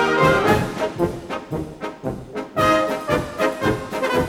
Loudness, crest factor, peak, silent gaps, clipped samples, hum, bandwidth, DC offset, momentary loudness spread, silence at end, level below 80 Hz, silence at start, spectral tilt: -21 LUFS; 18 dB; -2 dBFS; none; under 0.1%; none; 18 kHz; under 0.1%; 14 LU; 0 s; -42 dBFS; 0 s; -5.5 dB/octave